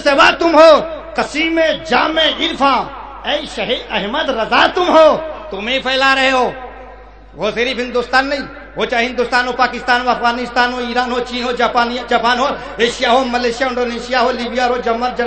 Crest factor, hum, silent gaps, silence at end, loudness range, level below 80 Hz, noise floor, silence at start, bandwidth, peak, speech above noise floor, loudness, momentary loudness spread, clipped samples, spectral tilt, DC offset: 14 dB; none; none; 0 s; 3 LU; -40 dBFS; -37 dBFS; 0 s; 9 kHz; 0 dBFS; 23 dB; -14 LUFS; 10 LU; under 0.1%; -3.5 dB/octave; 0.3%